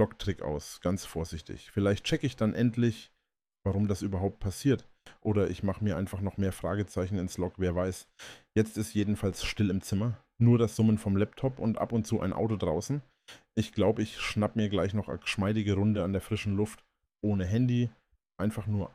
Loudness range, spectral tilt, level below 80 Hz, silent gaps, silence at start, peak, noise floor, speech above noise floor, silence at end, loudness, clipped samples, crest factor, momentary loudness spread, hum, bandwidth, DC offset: 3 LU; -6.5 dB/octave; -52 dBFS; none; 0 s; -14 dBFS; -82 dBFS; 53 dB; 0.05 s; -31 LUFS; under 0.1%; 16 dB; 8 LU; none; 15 kHz; under 0.1%